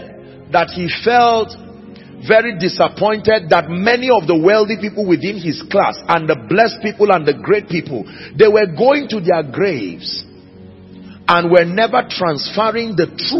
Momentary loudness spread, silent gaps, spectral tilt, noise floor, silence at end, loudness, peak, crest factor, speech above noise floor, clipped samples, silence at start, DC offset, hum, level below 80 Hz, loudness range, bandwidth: 10 LU; none; -6.5 dB/octave; -39 dBFS; 0 s; -15 LUFS; 0 dBFS; 16 dB; 24 dB; under 0.1%; 0 s; under 0.1%; none; -52 dBFS; 2 LU; 6 kHz